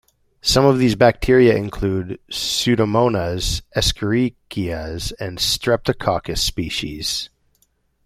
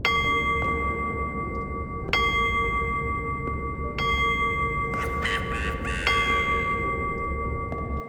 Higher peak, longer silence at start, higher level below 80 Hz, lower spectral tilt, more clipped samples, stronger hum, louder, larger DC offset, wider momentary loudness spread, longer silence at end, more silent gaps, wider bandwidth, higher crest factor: first, -2 dBFS vs -8 dBFS; first, 0.45 s vs 0 s; about the same, -34 dBFS vs -36 dBFS; about the same, -4.5 dB/octave vs -5 dB/octave; neither; neither; first, -19 LUFS vs -25 LUFS; neither; first, 12 LU vs 8 LU; first, 0.8 s vs 0 s; neither; about the same, 16 kHz vs 17.5 kHz; about the same, 18 dB vs 18 dB